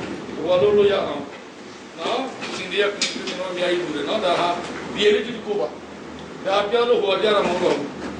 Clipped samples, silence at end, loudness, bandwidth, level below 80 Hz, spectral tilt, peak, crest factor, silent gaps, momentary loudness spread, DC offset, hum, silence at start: under 0.1%; 0 s; -21 LUFS; 10 kHz; -56 dBFS; -4 dB/octave; -6 dBFS; 16 dB; none; 17 LU; under 0.1%; none; 0 s